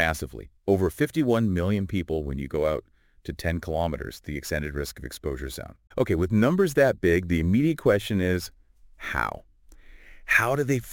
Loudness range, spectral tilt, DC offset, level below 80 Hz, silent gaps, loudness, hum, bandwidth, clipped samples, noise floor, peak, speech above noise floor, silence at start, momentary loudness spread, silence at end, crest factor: 7 LU; -6.5 dB/octave; under 0.1%; -44 dBFS; none; -25 LUFS; none; 17 kHz; under 0.1%; -49 dBFS; -6 dBFS; 24 dB; 0 s; 14 LU; 0 s; 20 dB